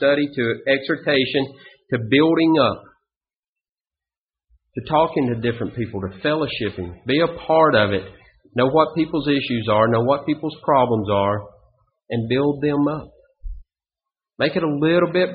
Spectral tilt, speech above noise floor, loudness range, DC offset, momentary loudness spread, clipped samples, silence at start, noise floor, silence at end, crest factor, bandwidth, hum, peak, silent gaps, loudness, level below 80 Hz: -4.5 dB/octave; over 71 dB; 5 LU; under 0.1%; 12 LU; under 0.1%; 0 s; under -90 dBFS; 0 s; 18 dB; 5 kHz; none; -2 dBFS; 3.17-3.21 s, 3.36-3.56 s, 3.69-3.78 s, 4.18-4.27 s; -20 LUFS; -48 dBFS